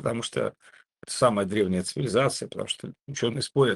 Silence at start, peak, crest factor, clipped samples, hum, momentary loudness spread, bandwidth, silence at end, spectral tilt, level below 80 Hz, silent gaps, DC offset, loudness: 0 s; -8 dBFS; 20 dB; under 0.1%; none; 10 LU; 12.5 kHz; 0 s; -4.5 dB/octave; -64 dBFS; none; under 0.1%; -27 LUFS